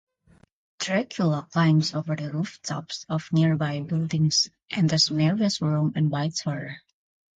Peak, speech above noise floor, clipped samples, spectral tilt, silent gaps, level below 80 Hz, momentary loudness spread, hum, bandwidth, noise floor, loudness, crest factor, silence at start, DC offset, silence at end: -8 dBFS; 35 dB; under 0.1%; -5 dB/octave; none; -64 dBFS; 11 LU; none; 9 kHz; -60 dBFS; -25 LUFS; 16 dB; 0.8 s; under 0.1%; 0.6 s